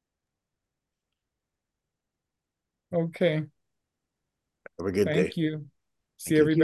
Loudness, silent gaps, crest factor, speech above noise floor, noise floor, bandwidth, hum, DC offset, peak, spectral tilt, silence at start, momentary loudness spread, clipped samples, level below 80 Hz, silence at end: -27 LUFS; none; 22 dB; 61 dB; -86 dBFS; 12.5 kHz; none; under 0.1%; -8 dBFS; -6.5 dB/octave; 2.9 s; 15 LU; under 0.1%; -60 dBFS; 0 s